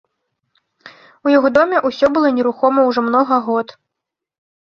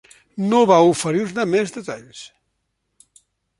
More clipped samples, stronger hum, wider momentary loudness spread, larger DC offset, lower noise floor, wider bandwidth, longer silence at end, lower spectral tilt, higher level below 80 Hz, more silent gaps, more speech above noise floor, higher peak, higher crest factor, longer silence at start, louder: neither; neither; second, 8 LU vs 23 LU; neither; first, -82 dBFS vs -73 dBFS; second, 6.8 kHz vs 11.5 kHz; second, 0.95 s vs 1.35 s; about the same, -6 dB/octave vs -5.5 dB/octave; about the same, -60 dBFS vs -64 dBFS; neither; first, 67 dB vs 55 dB; about the same, 0 dBFS vs -2 dBFS; about the same, 16 dB vs 18 dB; first, 0.85 s vs 0.35 s; about the same, -15 LUFS vs -17 LUFS